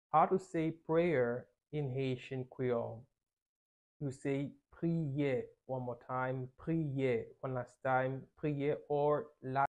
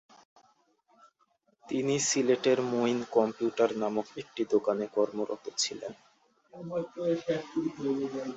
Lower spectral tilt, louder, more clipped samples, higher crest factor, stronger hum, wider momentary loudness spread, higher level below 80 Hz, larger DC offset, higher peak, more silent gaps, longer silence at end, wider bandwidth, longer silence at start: first, -8.5 dB/octave vs -4 dB/octave; second, -37 LUFS vs -30 LUFS; neither; about the same, 20 dB vs 20 dB; neither; about the same, 10 LU vs 10 LU; about the same, -70 dBFS vs -74 dBFS; neither; second, -16 dBFS vs -12 dBFS; first, 3.42-4.00 s vs none; about the same, 0.05 s vs 0 s; first, 10 kHz vs 8.4 kHz; second, 0.15 s vs 1.65 s